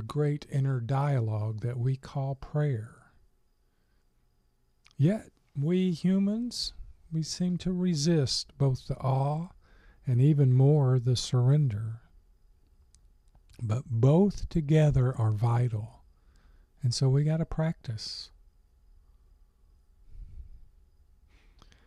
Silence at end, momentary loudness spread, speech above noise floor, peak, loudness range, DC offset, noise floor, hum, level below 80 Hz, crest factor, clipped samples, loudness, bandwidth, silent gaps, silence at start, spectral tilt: 1.35 s; 13 LU; 42 dB; -12 dBFS; 8 LU; under 0.1%; -69 dBFS; none; -50 dBFS; 18 dB; under 0.1%; -28 LUFS; 11 kHz; none; 0 s; -7 dB/octave